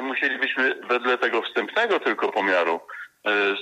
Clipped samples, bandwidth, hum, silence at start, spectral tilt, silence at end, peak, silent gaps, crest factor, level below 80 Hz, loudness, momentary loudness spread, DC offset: under 0.1%; 9.6 kHz; none; 0 s; -3.5 dB/octave; 0 s; -10 dBFS; none; 14 dB; -82 dBFS; -23 LUFS; 4 LU; under 0.1%